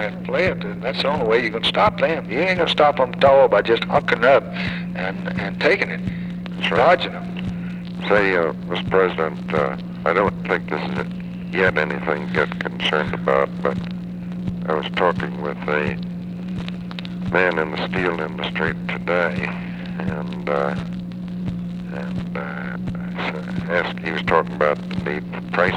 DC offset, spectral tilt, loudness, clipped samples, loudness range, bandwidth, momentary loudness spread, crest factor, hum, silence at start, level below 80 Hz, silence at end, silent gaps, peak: under 0.1%; -7 dB/octave; -21 LUFS; under 0.1%; 7 LU; 9.8 kHz; 12 LU; 20 dB; none; 0 s; -46 dBFS; 0 s; none; -2 dBFS